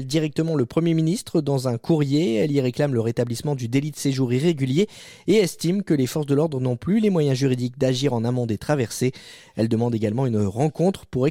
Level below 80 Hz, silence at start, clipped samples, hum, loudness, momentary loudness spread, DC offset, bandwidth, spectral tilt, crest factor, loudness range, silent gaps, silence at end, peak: -56 dBFS; 0 s; under 0.1%; none; -22 LUFS; 5 LU; under 0.1%; 16 kHz; -6.5 dB/octave; 14 dB; 2 LU; none; 0 s; -8 dBFS